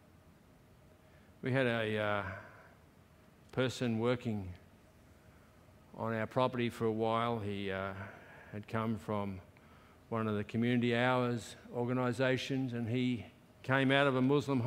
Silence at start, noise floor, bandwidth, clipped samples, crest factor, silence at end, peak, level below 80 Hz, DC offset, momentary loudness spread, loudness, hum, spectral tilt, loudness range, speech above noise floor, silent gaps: 1.45 s; -62 dBFS; 15 kHz; under 0.1%; 22 dB; 0 s; -12 dBFS; -68 dBFS; under 0.1%; 18 LU; -35 LUFS; none; -6.5 dB/octave; 6 LU; 28 dB; none